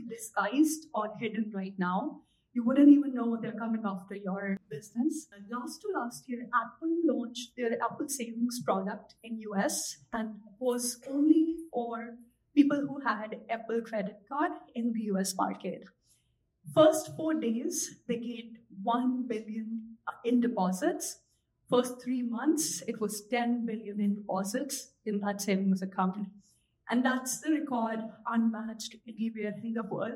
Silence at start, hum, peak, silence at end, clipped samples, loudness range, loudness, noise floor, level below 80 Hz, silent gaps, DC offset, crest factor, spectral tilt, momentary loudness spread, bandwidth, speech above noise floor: 0 s; none; -10 dBFS; 0 s; under 0.1%; 5 LU; -31 LUFS; -74 dBFS; -78 dBFS; none; under 0.1%; 22 dB; -5 dB/octave; 13 LU; 16 kHz; 43 dB